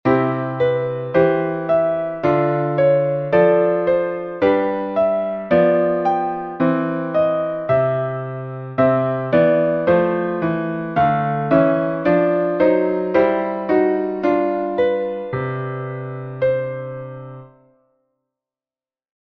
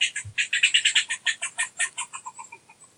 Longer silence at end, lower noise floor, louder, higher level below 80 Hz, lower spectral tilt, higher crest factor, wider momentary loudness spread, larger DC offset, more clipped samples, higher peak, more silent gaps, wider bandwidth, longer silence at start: first, 1.8 s vs 0.15 s; first, under -90 dBFS vs -50 dBFS; first, -18 LUFS vs -23 LUFS; first, -54 dBFS vs -70 dBFS; first, -10 dB/octave vs 2.5 dB/octave; about the same, 16 dB vs 20 dB; second, 9 LU vs 19 LU; neither; neither; first, -2 dBFS vs -6 dBFS; neither; second, 5.8 kHz vs 11.5 kHz; about the same, 0.05 s vs 0 s